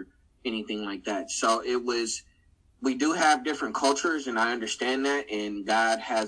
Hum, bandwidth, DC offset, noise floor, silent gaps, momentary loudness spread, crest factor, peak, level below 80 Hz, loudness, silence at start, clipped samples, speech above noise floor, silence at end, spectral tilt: none; 10.5 kHz; under 0.1%; -62 dBFS; none; 9 LU; 18 dB; -10 dBFS; -64 dBFS; -27 LUFS; 0 s; under 0.1%; 35 dB; 0 s; -2 dB/octave